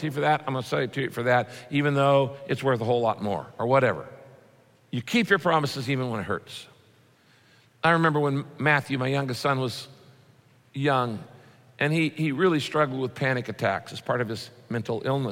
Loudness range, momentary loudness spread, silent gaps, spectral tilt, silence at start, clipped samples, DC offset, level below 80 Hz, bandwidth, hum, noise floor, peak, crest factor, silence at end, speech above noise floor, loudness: 3 LU; 11 LU; none; -6 dB/octave; 0 s; under 0.1%; under 0.1%; -68 dBFS; 16 kHz; none; -59 dBFS; -6 dBFS; 20 dB; 0 s; 34 dB; -25 LUFS